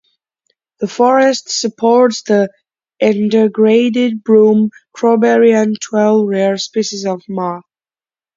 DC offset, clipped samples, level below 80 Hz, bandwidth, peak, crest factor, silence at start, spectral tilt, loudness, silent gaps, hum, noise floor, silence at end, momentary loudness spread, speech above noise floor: under 0.1%; under 0.1%; -62 dBFS; 7.6 kHz; 0 dBFS; 12 dB; 0.8 s; -5 dB/octave; -13 LUFS; none; none; under -90 dBFS; 0.75 s; 11 LU; over 78 dB